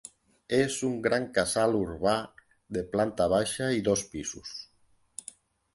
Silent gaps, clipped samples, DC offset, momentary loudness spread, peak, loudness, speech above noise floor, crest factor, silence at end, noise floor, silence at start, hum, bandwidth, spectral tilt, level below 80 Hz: none; under 0.1%; under 0.1%; 17 LU; -10 dBFS; -28 LUFS; 38 dB; 20 dB; 1.1 s; -66 dBFS; 0.5 s; none; 12 kHz; -4 dB/octave; -56 dBFS